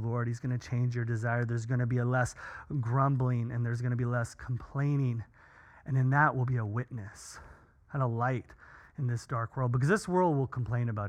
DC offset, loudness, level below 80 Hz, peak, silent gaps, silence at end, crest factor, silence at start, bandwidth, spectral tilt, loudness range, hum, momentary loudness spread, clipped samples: under 0.1%; -31 LUFS; -58 dBFS; -12 dBFS; none; 0 s; 18 dB; 0 s; 10 kHz; -7.5 dB/octave; 2 LU; none; 13 LU; under 0.1%